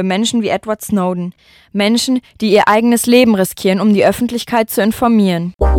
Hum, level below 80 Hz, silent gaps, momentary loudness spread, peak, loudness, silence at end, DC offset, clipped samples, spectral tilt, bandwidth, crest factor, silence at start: none; -28 dBFS; none; 8 LU; 0 dBFS; -13 LUFS; 0 s; under 0.1%; under 0.1%; -5 dB/octave; 17.5 kHz; 14 dB; 0 s